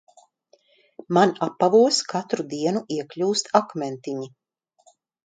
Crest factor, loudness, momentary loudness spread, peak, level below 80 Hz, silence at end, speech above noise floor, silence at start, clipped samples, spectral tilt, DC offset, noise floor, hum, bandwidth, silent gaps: 24 dB; -22 LUFS; 14 LU; 0 dBFS; -74 dBFS; 0.95 s; 39 dB; 1.1 s; under 0.1%; -4.5 dB/octave; under 0.1%; -61 dBFS; none; 9.6 kHz; none